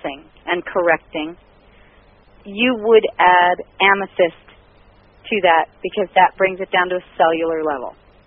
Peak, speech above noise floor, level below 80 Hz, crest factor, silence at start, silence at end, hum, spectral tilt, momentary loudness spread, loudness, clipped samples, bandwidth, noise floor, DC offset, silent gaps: 0 dBFS; 33 dB; -54 dBFS; 18 dB; 0.05 s; 0.35 s; none; -1 dB/octave; 14 LU; -17 LUFS; under 0.1%; 3.8 kHz; -50 dBFS; under 0.1%; none